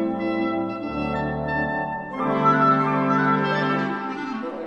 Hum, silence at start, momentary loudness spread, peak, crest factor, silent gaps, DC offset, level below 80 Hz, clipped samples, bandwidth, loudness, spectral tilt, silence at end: none; 0 s; 10 LU; -6 dBFS; 16 dB; none; under 0.1%; -48 dBFS; under 0.1%; 7.6 kHz; -23 LUFS; -7.5 dB/octave; 0 s